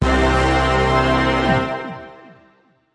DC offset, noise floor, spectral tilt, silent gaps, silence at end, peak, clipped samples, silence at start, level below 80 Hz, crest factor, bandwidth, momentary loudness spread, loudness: under 0.1%; -56 dBFS; -6 dB/octave; none; 0.8 s; -4 dBFS; under 0.1%; 0 s; -26 dBFS; 14 dB; 11 kHz; 12 LU; -17 LUFS